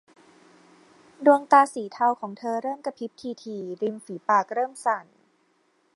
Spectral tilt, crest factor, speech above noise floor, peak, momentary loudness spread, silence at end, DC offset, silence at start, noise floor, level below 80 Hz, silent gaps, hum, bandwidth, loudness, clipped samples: -5 dB/octave; 22 dB; 43 dB; -4 dBFS; 16 LU; 0.95 s; under 0.1%; 1.2 s; -67 dBFS; -82 dBFS; none; none; 11.5 kHz; -25 LUFS; under 0.1%